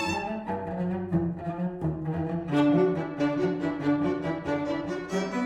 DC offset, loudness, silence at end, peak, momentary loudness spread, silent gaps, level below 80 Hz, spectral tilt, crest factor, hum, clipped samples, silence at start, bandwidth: under 0.1%; -28 LUFS; 0 s; -12 dBFS; 8 LU; none; -54 dBFS; -7.5 dB/octave; 16 dB; none; under 0.1%; 0 s; 10 kHz